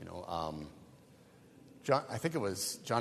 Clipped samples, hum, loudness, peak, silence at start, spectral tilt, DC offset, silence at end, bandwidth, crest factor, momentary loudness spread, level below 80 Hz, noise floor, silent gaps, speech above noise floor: under 0.1%; none; -36 LUFS; -14 dBFS; 0 s; -4.5 dB/octave; under 0.1%; 0 s; 13.5 kHz; 24 dB; 12 LU; -66 dBFS; -60 dBFS; none; 25 dB